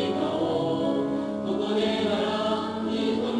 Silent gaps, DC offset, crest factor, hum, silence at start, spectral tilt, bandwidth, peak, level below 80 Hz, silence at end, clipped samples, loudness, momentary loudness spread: none; under 0.1%; 12 dB; none; 0 s; -6 dB/octave; 10.5 kHz; -14 dBFS; -58 dBFS; 0 s; under 0.1%; -26 LUFS; 4 LU